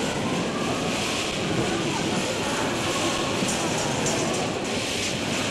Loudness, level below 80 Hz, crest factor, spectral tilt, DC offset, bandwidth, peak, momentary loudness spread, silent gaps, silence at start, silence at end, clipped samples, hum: -25 LUFS; -50 dBFS; 12 dB; -3.5 dB/octave; under 0.1%; 16 kHz; -12 dBFS; 2 LU; none; 0 s; 0 s; under 0.1%; none